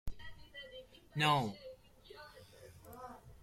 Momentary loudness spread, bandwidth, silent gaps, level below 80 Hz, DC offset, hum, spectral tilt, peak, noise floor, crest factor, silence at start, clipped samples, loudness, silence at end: 25 LU; 16 kHz; none; -56 dBFS; under 0.1%; none; -5 dB/octave; -18 dBFS; -58 dBFS; 22 dB; 0.05 s; under 0.1%; -35 LUFS; 0.1 s